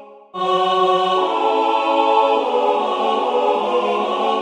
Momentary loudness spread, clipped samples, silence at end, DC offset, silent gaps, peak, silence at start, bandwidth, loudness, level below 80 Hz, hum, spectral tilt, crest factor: 3 LU; under 0.1%; 0 s; under 0.1%; none; -4 dBFS; 0 s; 10.5 kHz; -17 LUFS; -74 dBFS; none; -4.5 dB/octave; 14 dB